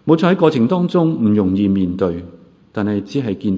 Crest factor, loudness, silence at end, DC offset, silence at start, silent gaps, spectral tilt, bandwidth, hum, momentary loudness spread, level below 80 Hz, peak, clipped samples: 16 dB; -16 LUFS; 0 s; under 0.1%; 0.05 s; none; -8.5 dB/octave; 7.8 kHz; none; 8 LU; -44 dBFS; 0 dBFS; under 0.1%